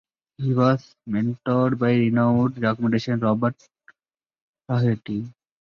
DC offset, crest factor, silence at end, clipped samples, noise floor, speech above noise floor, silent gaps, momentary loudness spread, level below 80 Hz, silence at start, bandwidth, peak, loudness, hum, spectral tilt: under 0.1%; 16 dB; 0.3 s; under 0.1%; under -90 dBFS; over 69 dB; 4.42-4.54 s; 9 LU; -58 dBFS; 0.4 s; 6.8 kHz; -8 dBFS; -22 LUFS; none; -9 dB/octave